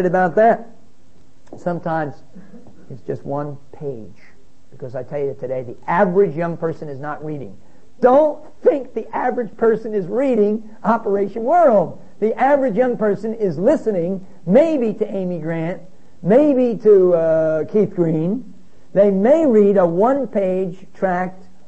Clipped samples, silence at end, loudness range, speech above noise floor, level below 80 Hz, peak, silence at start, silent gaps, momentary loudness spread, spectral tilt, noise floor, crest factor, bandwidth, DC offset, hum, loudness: under 0.1%; 0.35 s; 12 LU; 36 dB; -58 dBFS; -2 dBFS; 0 s; none; 15 LU; -9 dB/octave; -53 dBFS; 16 dB; 8.2 kHz; 2%; none; -18 LUFS